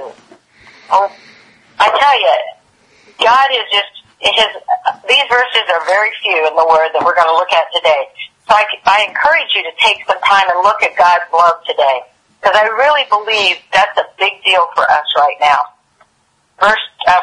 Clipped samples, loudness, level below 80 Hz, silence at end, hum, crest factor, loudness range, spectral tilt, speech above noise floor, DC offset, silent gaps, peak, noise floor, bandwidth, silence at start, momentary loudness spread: under 0.1%; -12 LUFS; -54 dBFS; 0 s; none; 12 dB; 2 LU; -1 dB/octave; 46 dB; under 0.1%; none; 0 dBFS; -58 dBFS; 11 kHz; 0 s; 6 LU